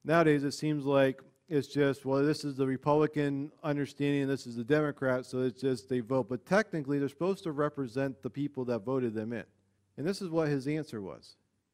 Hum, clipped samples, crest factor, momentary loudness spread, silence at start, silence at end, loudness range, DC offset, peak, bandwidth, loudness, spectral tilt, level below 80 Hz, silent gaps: none; under 0.1%; 18 dB; 8 LU; 0.05 s; 0.45 s; 5 LU; under 0.1%; -12 dBFS; 14 kHz; -32 LUFS; -7 dB/octave; -70 dBFS; none